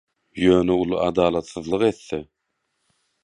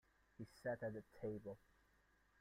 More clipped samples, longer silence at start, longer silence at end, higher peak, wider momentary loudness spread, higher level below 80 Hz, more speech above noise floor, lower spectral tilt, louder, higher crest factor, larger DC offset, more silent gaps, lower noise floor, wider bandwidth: neither; about the same, 0.35 s vs 0.4 s; first, 1 s vs 0.85 s; first, -4 dBFS vs -34 dBFS; about the same, 14 LU vs 13 LU; first, -48 dBFS vs -76 dBFS; first, 55 dB vs 28 dB; about the same, -6.5 dB/octave vs -7.5 dB/octave; first, -21 LUFS vs -51 LUFS; about the same, 18 dB vs 18 dB; neither; neither; about the same, -75 dBFS vs -77 dBFS; second, 10 kHz vs 15.5 kHz